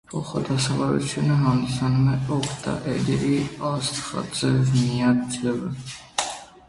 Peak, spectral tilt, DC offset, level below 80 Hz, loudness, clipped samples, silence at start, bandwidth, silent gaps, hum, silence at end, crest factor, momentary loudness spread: -6 dBFS; -5.5 dB/octave; under 0.1%; -50 dBFS; -24 LUFS; under 0.1%; 0.1 s; 11.5 kHz; none; none; 0.2 s; 16 dB; 8 LU